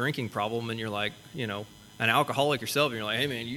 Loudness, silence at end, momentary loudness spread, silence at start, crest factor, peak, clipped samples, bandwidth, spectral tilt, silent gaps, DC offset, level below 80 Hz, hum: -29 LUFS; 0 s; 10 LU; 0 s; 22 dB; -8 dBFS; under 0.1%; 18.5 kHz; -4.5 dB/octave; none; under 0.1%; -64 dBFS; none